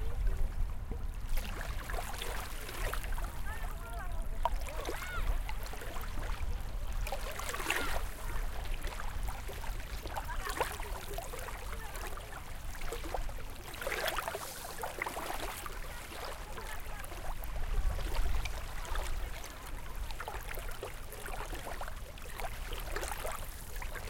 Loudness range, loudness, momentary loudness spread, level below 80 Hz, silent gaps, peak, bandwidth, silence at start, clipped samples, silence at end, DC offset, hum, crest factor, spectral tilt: 3 LU; -41 LUFS; 7 LU; -38 dBFS; none; -14 dBFS; 17 kHz; 0 s; under 0.1%; 0 s; under 0.1%; none; 22 dB; -3.5 dB/octave